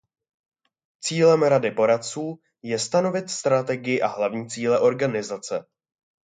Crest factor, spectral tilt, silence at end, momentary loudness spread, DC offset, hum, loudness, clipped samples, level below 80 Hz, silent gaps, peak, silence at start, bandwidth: 18 dB; -4.5 dB/octave; 0.7 s; 13 LU; under 0.1%; none; -23 LUFS; under 0.1%; -72 dBFS; none; -6 dBFS; 1.05 s; 9.4 kHz